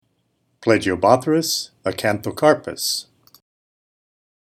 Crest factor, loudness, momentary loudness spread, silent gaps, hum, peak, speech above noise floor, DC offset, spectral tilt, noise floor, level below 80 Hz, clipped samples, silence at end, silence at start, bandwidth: 22 dB; -19 LUFS; 8 LU; none; none; 0 dBFS; 49 dB; under 0.1%; -4 dB/octave; -68 dBFS; -58 dBFS; under 0.1%; 1.5 s; 0.6 s; 18 kHz